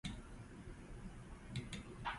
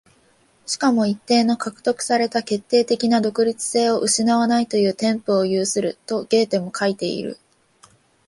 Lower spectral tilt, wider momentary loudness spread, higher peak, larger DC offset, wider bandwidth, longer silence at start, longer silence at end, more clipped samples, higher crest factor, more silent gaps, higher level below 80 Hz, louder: about the same, -5 dB/octave vs -4 dB/octave; about the same, 8 LU vs 7 LU; second, -30 dBFS vs -4 dBFS; neither; about the same, 11.5 kHz vs 11.5 kHz; second, 0.05 s vs 0.7 s; second, 0 s vs 0.95 s; neither; about the same, 20 dB vs 16 dB; neither; first, -56 dBFS vs -66 dBFS; second, -51 LUFS vs -20 LUFS